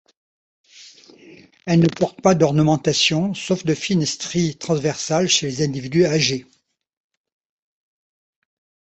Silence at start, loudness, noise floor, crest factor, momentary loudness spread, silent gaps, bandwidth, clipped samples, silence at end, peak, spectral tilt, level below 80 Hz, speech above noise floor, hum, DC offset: 0.8 s; -19 LUFS; -47 dBFS; 20 dB; 6 LU; none; 8.4 kHz; under 0.1%; 2.55 s; -2 dBFS; -4.5 dB/octave; -56 dBFS; 28 dB; none; under 0.1%